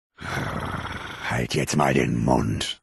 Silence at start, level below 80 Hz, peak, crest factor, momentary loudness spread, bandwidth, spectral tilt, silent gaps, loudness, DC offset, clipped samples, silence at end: 0.2 s; -42 dBFS; -6 dBFS; 20 dB; 10 LU; 12.5 kHz; -5 dB/octave; none; -25 LUFS; under 0.1%; under 0.1%; 0.1 s